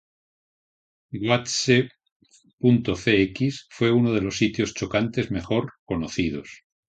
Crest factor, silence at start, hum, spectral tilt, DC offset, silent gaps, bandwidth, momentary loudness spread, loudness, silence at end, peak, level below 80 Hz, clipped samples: 20 dB; 1.1 s; none; -5.5 dB/octave; under 0.1%; 2.12-2.20 s, 2.53-2.58 s, 5.79-5.86 s; 9.2 kHz; 10 LU; -23 LUFS; 0.35 s; -4 dBFS; -50 dBFS; under 0.1%